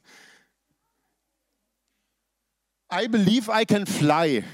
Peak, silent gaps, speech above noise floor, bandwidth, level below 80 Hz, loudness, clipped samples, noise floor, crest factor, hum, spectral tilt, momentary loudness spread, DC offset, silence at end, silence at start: -6 dBFS; none; 58 dB; 16 kHz; -68 dBFS; -22 LUFS; under 0.1%; -80 dBFS; 20 dB; none; -5.5 dB/octave; 6 LU; under 0.1%; 0 s; 2.9 s